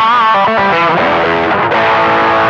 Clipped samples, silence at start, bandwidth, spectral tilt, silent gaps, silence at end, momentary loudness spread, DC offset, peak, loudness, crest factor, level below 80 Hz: under 0.1%; 0 s; 8.2 kHz; -5.5 dB/octave; none; 0 s; 3 LU; under 0.1%; -2 dBFS; -10 LUFS; 8 dB; -44 dBFS